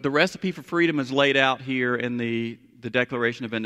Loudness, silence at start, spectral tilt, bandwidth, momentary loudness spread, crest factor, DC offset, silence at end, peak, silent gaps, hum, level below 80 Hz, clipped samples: -24 LUFS; 0 s; -5.5 dB/octave; 13 kHz; 9 LU; 20 dB; under 0.1%; 0 s; -4 dBFS; none; none; -66 dBFS; under 0.1%